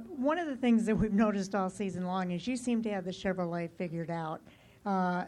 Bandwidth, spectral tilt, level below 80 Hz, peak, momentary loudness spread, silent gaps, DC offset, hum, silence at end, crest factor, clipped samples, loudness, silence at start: 11 kHz; -6.5 dB/octave; -56 dBFS; -18 dBFS; 9 LU; none; under 0.1%; none; 0 s; 14 dB; under 0.1%; -32 LUFS; 0 s